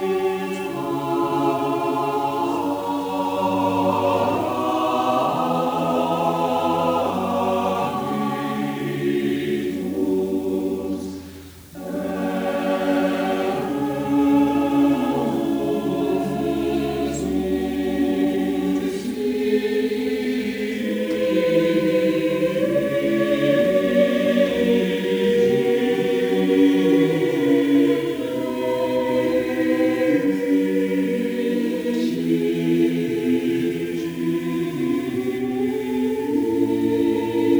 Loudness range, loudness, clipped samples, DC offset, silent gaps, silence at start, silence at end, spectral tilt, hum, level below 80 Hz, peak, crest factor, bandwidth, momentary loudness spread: 5 LU; -21 LUFS; under 0.1%; under 0.1%; none; 0 s; 0 s; -6.5 dB/octave; none; -52 dBFS; -6 dBFS; 16 dB; over 20 kHz; 6 LU